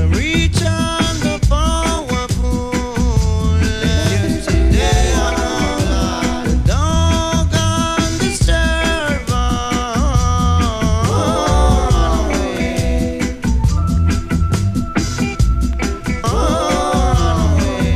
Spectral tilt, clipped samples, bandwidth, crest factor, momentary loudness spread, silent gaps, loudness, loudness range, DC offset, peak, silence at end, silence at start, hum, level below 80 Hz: -5 dB/octave; under 0.1%; 14.5 kHz; 14 dB; 4 LU; none; -16 LUFS; 2 LU; under 0.1%; 0 dBFS; 0 s; 0 s; none; -18 dBFS